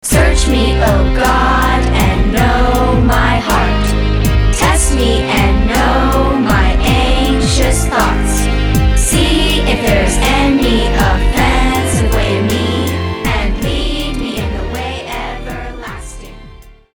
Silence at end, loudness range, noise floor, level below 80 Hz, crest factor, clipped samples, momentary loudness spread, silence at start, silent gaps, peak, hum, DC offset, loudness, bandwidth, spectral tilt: 0.25 s; 6 LU; -36 dBFS; -16 dBFS; 12 dB; under 0.1%; 9 LU; 0.05 s; none; 0 dBFS; none; under 0.1%; -13 LUFS; over 20 kHz; -4.5 dB/octave